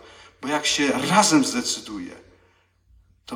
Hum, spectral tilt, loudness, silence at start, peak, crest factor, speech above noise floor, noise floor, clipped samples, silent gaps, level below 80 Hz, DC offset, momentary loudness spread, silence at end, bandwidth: none; -2.5 dB/octave; -20 LUFS; 0.4 s; -4 dBFS; 20 dB; 40 dB; -61 dBFS; under 0.1%; none; -60 dBFS; under 0.1%; 18 LU; 0 s; 17 kHz